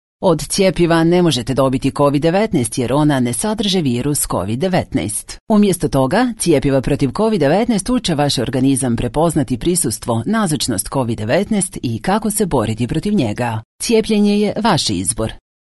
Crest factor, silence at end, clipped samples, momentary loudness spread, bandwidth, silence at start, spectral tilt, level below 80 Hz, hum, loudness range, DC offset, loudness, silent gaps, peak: 14 dB; 0.4 s; under 0.1%; 5 LU; 12 kHz; 0.2 s; -5 dB/octave; -36 dBFS; none; 2 LU; 0.3%; -16 LUFS; 5.40-5.47 s, 13.65-13.79 s; -2 dBFS